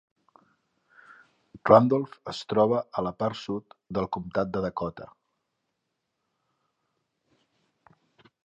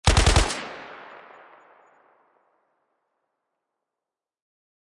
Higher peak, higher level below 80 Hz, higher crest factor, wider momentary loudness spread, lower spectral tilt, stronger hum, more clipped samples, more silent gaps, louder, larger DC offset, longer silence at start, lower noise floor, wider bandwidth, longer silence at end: first, -2 dBFS vs -6 dBFS; second, -60 dBFS vs -32 dBFS; about the same, 26 dB vs 22 dB; second, 17 LU vs 26 LU; first, -7.5 dB/octave vs -3.5 dB/octave; neither; neither; neither; second, -26 LUFS vs -22 LUFS; neither; first, 1.55 s vs 0.05 s; second, -81 dBFS vs -89 dBFS; second, 8.2 kHz vs 11.5 kHz; second, 3.4 s vs 4 s